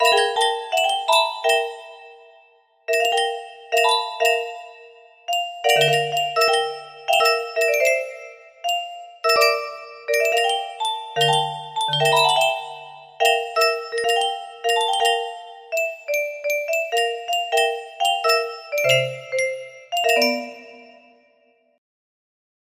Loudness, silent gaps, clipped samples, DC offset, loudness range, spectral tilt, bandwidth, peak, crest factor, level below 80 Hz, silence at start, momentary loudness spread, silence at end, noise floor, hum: -20 LUFS; none; under 0.1%; under 0.1%; 3 LU; -1.5 dB/octave; 15.5 kHz; -4 dBFS; 18 dB; -72 dBFS; 0 s; 15 LU; 1.95 s; -61 dBFS; none